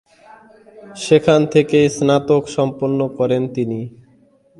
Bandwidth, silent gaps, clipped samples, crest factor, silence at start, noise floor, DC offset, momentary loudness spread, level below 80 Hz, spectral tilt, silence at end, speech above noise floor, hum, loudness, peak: 11.5 kHz; none; under 0.1%; 18 dB; 0.75 s; -53 dBFS; under 0.1%; 14 LU; -54 dBFS; -6 dB/octave; 0.7 s; 37 dB; none; -16 LUFS; 0 dBFS